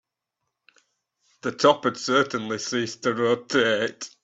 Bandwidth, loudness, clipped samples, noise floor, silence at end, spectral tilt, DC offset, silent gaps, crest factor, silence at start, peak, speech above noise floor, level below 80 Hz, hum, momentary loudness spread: 8.2 kHz; -23 LUFS; under 0.1%; -82 dBFS; 0.15 s; -3.5 dB/octave; under 0.1%; none; 22 dB; 1.45 s; -4 dBFS; 58 dB; -70 dBFS; none; 9 LU